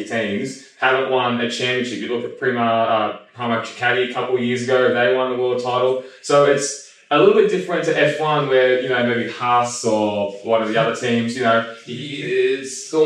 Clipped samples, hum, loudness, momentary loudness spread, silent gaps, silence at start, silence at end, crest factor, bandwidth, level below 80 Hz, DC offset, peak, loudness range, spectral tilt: under 0.1%; none; -19 LUFS; 9 LU; none; 0 s; 0 s; 18 dB; 10.5 kHz; -72 dBFS; under 0.1%; 0 dBFS; 3 LU; -4.5 dB/octave